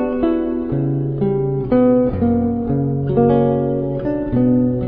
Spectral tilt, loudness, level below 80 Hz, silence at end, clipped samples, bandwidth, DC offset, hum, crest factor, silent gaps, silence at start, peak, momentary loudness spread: -13 dB/octave; -17 LUFS; -38 dBFS; 0 s; under 0.1%; 4 kHz; under 0.1%; none; 14 dB; none; 0 s; -2 dBFS; 6 LU